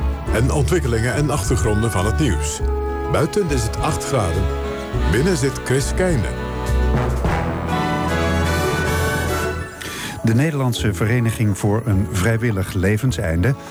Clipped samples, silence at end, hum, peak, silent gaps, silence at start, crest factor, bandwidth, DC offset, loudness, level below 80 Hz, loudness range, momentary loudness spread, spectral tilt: under 0.1%; 0 s; none; -6 dBFS; none; 0 s; 12 dB; over 20 kHz; under 0.1%; -20 LUFS; -28 dBFS; 1 LU; 4 LU; -5.5 dB/octave